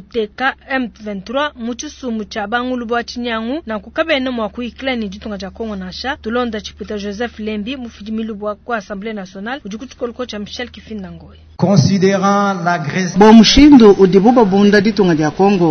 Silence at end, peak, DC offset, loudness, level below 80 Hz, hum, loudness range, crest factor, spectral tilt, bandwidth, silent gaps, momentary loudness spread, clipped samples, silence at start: 0 s; 0 dBFS; under 0.1%; -14 LUFS; -36 dBFS; none; 15 LU; 14 dB; -5.5 dB/octave; 6.6 kHz; none; 19 LU; 0.3%; 0.15 s